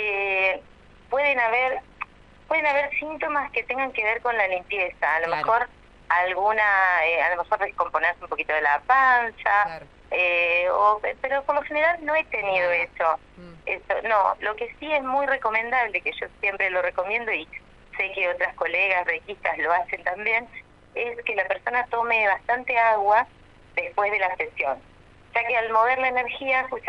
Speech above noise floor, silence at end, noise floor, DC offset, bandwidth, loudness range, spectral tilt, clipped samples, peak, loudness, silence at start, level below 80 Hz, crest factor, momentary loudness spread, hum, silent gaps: 27 dB; 0 s; -51 dBFS; under 0.1%; 8.4 kHz; 4 LU; -4.5 dB/octave; under 0.1%; -6 dBFS; -23 LUFS; 0 s; -56 dBFS; 18 dB; 9 LU; none; none